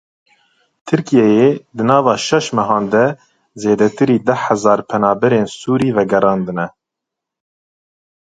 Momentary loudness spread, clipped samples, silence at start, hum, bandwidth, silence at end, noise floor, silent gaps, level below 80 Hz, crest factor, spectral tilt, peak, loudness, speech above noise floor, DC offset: 7 LU; under 0.1%; 0.85 s; none; 9.4 kHz; 1.65 s; -81 dBFS; none; -56 dBFS; 16 dB; -6 dB/octave; 0 dBFS; -15 LUFS; 68 dB; under 0.1%